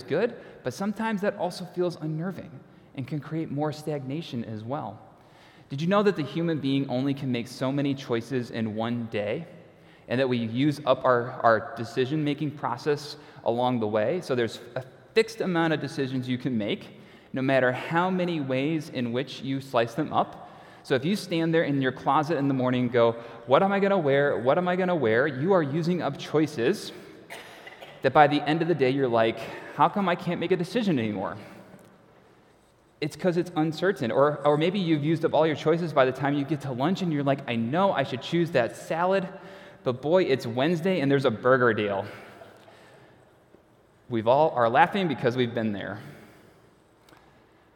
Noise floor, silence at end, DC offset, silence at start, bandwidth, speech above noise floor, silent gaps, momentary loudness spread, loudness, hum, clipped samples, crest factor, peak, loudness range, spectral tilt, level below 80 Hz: -60 dBFS; 1.5 s; under 0.1%; 0 s; 16.5 kHz; 34 dB; none; 12 LU; -26 LUFS; none; under 0.1%; 22 dB; -4 dBFS; 6 LU; -6.5 dB/octave; -70 dBFS